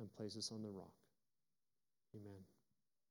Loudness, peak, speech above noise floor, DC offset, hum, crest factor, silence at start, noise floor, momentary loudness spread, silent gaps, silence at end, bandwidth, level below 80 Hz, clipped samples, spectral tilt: -52 LUFS; -34 dBFS; over 38 dB; under 0.1%; none; 22 dB; 0 s; under -90 dBFS; 16 LU; none; 0.55 s; 17.5 kHz; under -90 dBFS; under 0.1%; -4.5 dB/octave